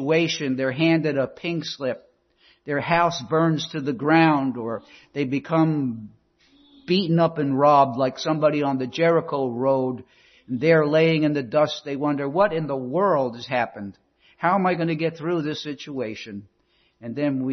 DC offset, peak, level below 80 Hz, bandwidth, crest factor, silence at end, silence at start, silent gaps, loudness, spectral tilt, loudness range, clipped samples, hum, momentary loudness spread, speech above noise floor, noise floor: under 0.1%; -4 dBFS; -64 dBFS; 6.4 kHz; 18 dB; 0 s; 0 s; none; -22 LUFS; -6.5 dB/octave; 4 LU; under 0.1%; none; 13 LU; 41 dB; -63 dBFS